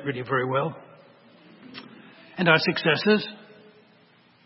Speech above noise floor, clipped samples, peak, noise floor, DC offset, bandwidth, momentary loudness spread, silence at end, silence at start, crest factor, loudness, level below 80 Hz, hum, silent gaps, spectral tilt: 35 dB; under 0.1%; -4 dBFS; -58 dBFS; under 0.1%; 5.8 kHz; 23 LU; 1.1 s; 0 s; 22 dB; -23 LUFS; -72 dBFS; none; none; -9 dB/octave